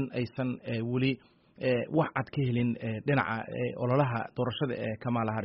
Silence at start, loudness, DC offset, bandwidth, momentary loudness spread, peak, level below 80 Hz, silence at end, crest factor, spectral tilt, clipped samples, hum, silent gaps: 0 s; -31 LUFS; under 0.1%; 5.6 kHz; 6 LU; -12 dBFS; -64 dBFS; 0 s; 18 dB; -6 dB/octave; under 0.1%; none; none